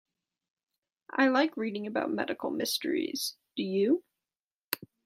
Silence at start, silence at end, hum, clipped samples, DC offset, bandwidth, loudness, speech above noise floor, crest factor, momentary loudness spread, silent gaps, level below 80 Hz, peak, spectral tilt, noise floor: 1.15 s; 0.2 s; none; under 0.1%; under 0.1%; 16 kHz; -31 LUFS; over 60 dB; 24 dB; 11 LU; 4.42-4.69 s; -80 dBFS; -8 dBFS; -3.5 dB/octave; under -90 dBFS